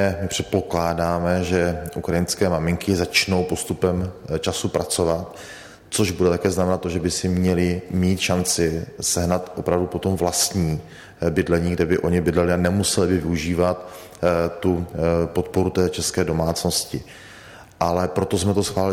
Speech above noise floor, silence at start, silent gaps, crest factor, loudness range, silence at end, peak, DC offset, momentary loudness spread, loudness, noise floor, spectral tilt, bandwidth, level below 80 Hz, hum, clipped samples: 22 dB; 0 s; none; 16 dB; 2 LU; 0 s; -6 dBFS; under 0.1%; 7 LU; -22 LUFS; -43 dBFS; -5 dB/octave; 16.5 kHz; -42 dBFS; none; under 0.1%